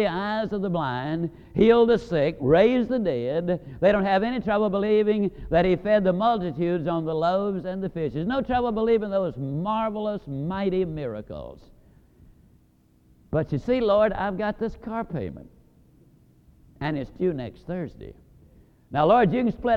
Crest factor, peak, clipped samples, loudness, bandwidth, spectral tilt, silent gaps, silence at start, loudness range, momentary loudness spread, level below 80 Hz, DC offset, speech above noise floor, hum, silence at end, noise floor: 18 dB; -6 dBFS; under 0.1%; -24 LUFS; 7.2 kHz; -8.5 dB/octave; none; 0 s; 10 LU; 13 LU; -48 dBFS; under 0.1%; 36 dB; none; 0 s; -60 dBFS